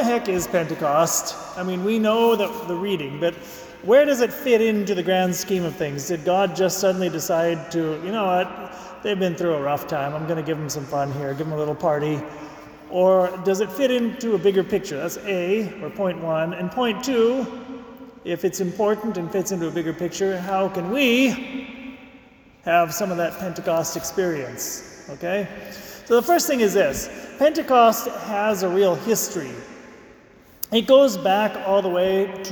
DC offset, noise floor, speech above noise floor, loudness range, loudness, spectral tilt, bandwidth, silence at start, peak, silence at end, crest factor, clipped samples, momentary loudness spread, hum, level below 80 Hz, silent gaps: under 0.1%; -50 dBFS; 28 dB; 5 LU; -22 LUFS; -4.5 dB/octave; 19 kHz; 0 s; -4 dBFS; 0 s; 18 dB; under 0.1%; 14 LU; none; -56 dBFS; none